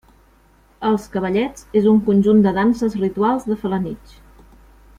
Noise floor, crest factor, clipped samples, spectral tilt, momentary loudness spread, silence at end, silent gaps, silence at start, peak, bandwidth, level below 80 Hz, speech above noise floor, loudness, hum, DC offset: -53 dBFS; 14 dB; under 0.1%; -8 dB/octave; 10 LU; 1 s; none; 0.8 s; -4 dBFS; 11 kHz; -46 dBFS; 36 dB; -18 LUFS; none; under 0.1%